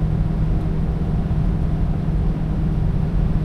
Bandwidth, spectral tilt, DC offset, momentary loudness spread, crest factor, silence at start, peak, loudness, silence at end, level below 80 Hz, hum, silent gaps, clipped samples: 5.6 kHz; -10 dB/octave; under 0.1%; 1 LU; 12 dB; 0 s; -6 dBFS; -22 LUFS; 0 s; -22 dBFS; none; none; under 0.1%